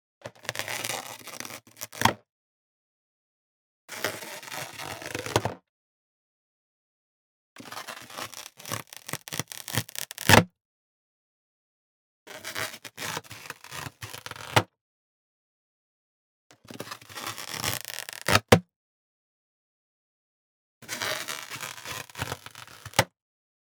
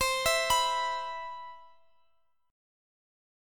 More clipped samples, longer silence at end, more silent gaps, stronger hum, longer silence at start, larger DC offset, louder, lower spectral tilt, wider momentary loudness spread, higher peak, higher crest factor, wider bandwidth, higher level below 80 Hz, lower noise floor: neither; second, 0.55 s vs 1.8 s; first, 2.31-3.88 s, 5.69-7.56 s, 10.61-12.26 s, 14.81-16.50 s, 18.76-20.81 s vs none; neither; first, 0.25 s vs 0 s; neither; about the same, -29 LUFS vs -29 LUFS; first, -3.5 dB/octave vs 0.5 dB/octave; about the same, 17 LU vs 18 LU; first, -2 dBFS vs -14 dBFS; first, 32 dB vs 20 dB; first, over 20 kHz vs 17.5 kHz; about the same, -60 dBFS vs -56 dBFS; first, under -90 dBFS vs -73 dBFS